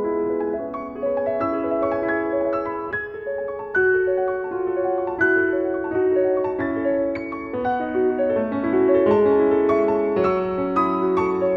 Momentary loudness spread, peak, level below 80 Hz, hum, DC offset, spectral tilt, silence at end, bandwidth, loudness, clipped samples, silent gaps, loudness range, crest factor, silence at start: 9 LU; -6 dBFS; -52 dBFS; none; under 0.1%; -8.5 dB/octave; 0 s; 5.8 kHz; -21 LUFS; under 0.1%; none; 4 LU; 14 dB; 0 s